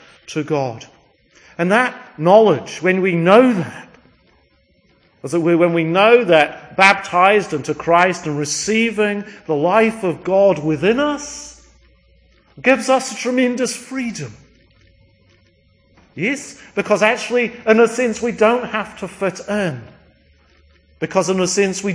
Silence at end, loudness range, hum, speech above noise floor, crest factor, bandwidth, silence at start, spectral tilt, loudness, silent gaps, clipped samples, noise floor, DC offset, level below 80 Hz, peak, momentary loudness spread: 0 s; 8 LU; none; 41 dB; 18 dB; 10.5 kHz; 0.3 s; -4.5 dB/octave; -16 LUFS; none; under 0.1%; -57 dBFS; under 0.1%; -56 dBFS; 0 dBFS; 14 LU